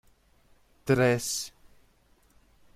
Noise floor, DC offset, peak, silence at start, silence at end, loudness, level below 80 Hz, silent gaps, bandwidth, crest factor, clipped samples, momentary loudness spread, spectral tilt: -64 dBFS; under 0.1%; -10 dBFS; 0.85 s; 1.25 s; -26 LUFS; -60 dBFS; none; 15.5 kHz; 22 dB; under 0.1%; 17 LU; -4.5 dB/octave